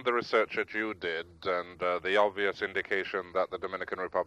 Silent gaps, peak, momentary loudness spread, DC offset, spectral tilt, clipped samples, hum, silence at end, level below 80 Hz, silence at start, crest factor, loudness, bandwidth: none; -12 dBFS; 8 LU; under 0.1%; -4.5 dB/octave; under 0.1%; none; 0 s; -68 dBFS; 0 s; 20 dB; -31 LUFS; 9.8 kHz